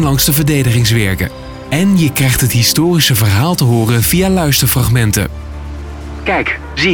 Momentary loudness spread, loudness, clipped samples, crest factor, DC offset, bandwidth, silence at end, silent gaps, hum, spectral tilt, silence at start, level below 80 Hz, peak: 14 LU; -12 LUFS; under 0.1%; 12 dB; under 0.1%; 19 kHz; 0 s; none; none; -4.5 dB/octave; 0 s; -28 dBFS; 0 dBFS